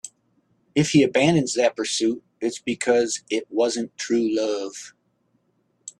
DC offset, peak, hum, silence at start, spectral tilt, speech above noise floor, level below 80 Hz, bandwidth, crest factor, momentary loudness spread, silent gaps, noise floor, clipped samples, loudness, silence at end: under 0.1%; -4 dBFS; none; 0.05 s; -4.5 dB/octave; 46 dB; -62 dBFS; 12 kHz; 18 dB; 13 LU; none; -68 dBFS; under 0.1%; -22 LUFS; 0.1 s